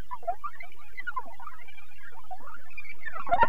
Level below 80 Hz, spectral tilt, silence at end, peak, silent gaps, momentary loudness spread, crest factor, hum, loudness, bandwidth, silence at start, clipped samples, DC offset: -52 dBFS; -5.5 dB/octave; 0 s; -10 dBFS; none; 14 LU; 22 dB; none; -39 LUFS; 16 kHz; 0 s; under 0.1%; 6%